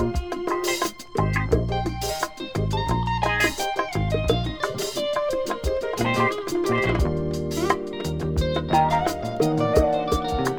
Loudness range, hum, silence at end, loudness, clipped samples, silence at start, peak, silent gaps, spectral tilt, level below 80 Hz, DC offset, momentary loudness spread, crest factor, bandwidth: 2 LU; none; 0 s; -24 LUFS; under 0.1%; 0 s; -4 dBFS; none; -5.5 dB/octave; -34 dBFS; 0.5%; 6 LU; 20 dB; over 20 kHz